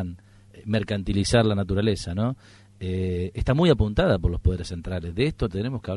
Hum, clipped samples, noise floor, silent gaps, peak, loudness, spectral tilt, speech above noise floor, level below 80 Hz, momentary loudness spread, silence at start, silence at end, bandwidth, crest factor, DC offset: none; under 0.1%; -49 dBFS; none; -6 dBFS; -24 LUFS; -6.5 dB/octave; 26 dB; -36 dBFS; 11 LU; 0 s; 0 s; 11.5 kHz; 20 dB; under 0.1%